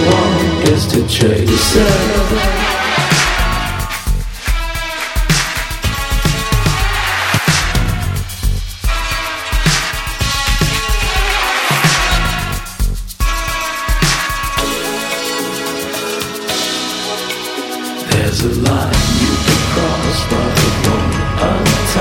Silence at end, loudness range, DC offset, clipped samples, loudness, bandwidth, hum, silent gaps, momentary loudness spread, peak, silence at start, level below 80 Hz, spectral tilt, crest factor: 0 s; 4 LU; under 0.1%; under 0.1%; -15 LUFS; 19 kHz; none; none; 8 LU; 0 dBFS; 0 s; -20 dBFS; -4 dB/octave; 14 dB